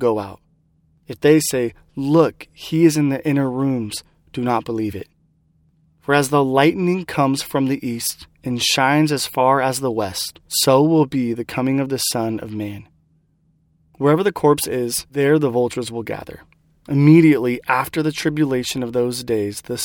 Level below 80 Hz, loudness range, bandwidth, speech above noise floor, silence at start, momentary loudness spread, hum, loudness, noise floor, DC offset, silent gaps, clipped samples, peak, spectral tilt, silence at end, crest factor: -54 dBFS; 4 LU; 18.5 kHz; 43 dB; 0 s; 12 LU; none; -18 LUFS; -61 dBFS; under 0.1%; none; under 0.1%; 0 dBFS; -5 dB/octave; 0 s; 18 dB